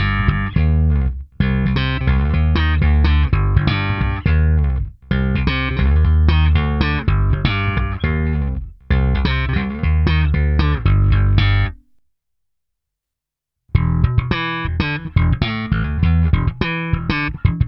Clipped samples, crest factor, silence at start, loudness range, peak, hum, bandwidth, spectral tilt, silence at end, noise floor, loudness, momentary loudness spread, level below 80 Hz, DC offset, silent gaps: under 0.1%; 16 dB; 0 s; 4 LU; 0 dBFS; none; 5.8 kHz; -9 dB/octave; 0 s; -83 dBFS; -18 LUFS; 6 LU; -20 dBFS; under 0.1%; none